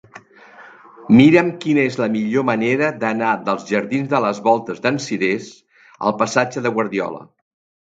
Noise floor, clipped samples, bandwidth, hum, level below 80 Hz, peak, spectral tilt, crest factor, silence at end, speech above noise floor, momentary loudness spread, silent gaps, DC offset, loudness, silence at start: -44 dBFS; under 0.1%; 8 kHz; none; -62 dBFS; 0 dBFS; -6 dB/octave; 18 dB; 0.75 s; 27 dB; 10 LU; none; under 0.1%; -18 LUFS; 0.15 s